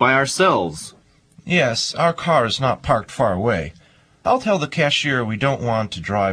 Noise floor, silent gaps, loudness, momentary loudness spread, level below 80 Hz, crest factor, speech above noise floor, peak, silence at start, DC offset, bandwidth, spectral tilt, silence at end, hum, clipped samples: -51 dBFS; none; -19 LUFS; 8 LU; -46 dBFS; 18 dB; 32 dB; -2 dBFS; 0 s; under 0.1%; 14 kHz; -4.5 dB/octave; 0 s; none; under 0.1%